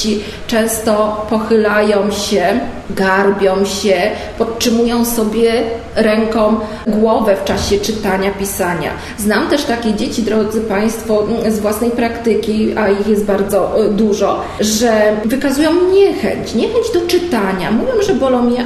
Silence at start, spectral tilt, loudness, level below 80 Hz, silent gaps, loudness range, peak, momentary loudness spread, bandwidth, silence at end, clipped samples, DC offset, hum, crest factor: 0 s; -4.5 dB/octave; -14 LUFS; -36 dBFS; none; 2 LU; 0 dBFS; 5 LU; 13.5 kHz; 0 s; under 0.1%; 0.1%; none; 14 dB